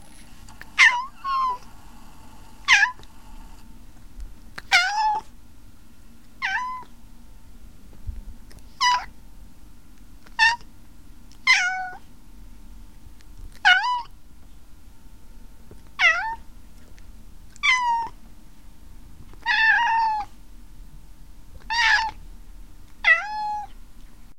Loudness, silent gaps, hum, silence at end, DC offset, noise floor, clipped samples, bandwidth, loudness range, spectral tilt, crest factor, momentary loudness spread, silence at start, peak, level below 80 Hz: -21 LUFS; none; none; 0.3 s; 0.8%; -49 dBFS; under 0.1%; 16.5 kHz; 6 LU; 0 dB/octave; 24 dB; 23 LU; 0.2 s; -4 dBFS; -46 dBFS